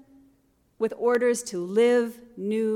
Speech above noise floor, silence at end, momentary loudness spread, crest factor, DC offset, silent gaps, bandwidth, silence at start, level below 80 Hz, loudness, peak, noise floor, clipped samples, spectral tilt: 41 dB; 0 s; 10 LU; 14 dB; under 0.1%; none; 15 kHz; 0.8 s; -72 dBFS; -25 LUFS; -12 dBFS; -65 dBFS; under 0.1%; -4.5 dB/octave